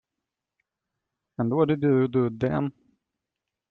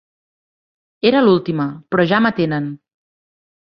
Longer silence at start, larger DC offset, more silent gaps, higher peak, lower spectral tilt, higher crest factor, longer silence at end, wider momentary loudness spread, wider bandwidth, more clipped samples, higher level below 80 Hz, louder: first, 1.4 s vs 1.05 s; neither; neither; second, -8 dBFS vs -2 dBFS; first, -10.5 dB/octave vs -9 dB/octave; about the same, 18 dB vs 18 dB; about the same, 1 s vs 1.05 s; about the same, 10 LU vs 9 LU; second, 4.5 kHz vs 6 kHz; neither; about the same, -60 dBFS vs -58 dBFS; second, -25 LUFS vs -16 LUFS